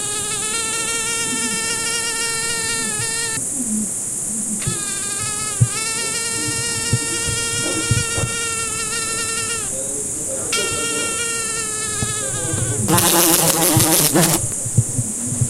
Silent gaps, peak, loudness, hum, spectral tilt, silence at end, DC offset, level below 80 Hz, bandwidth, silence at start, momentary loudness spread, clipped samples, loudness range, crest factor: none; 0 dBFS; -18 LUFS; none; -2.5 dB/octave; 0 s; under 0.1%; -44 dBFS; 16 kHz; 0 s; 8 LU; under 0.1%; 5 LU; 20 dB